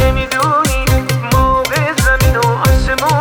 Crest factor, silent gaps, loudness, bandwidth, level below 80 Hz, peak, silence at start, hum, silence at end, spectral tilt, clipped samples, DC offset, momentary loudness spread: 12 dB; none; -13 LUFS; over 20 kHz; -18 dBFS; 0 dBFS; 0 s; none; 0 s; -4.5 dB/octave; under 0.1%; under 0.1%; 3 LU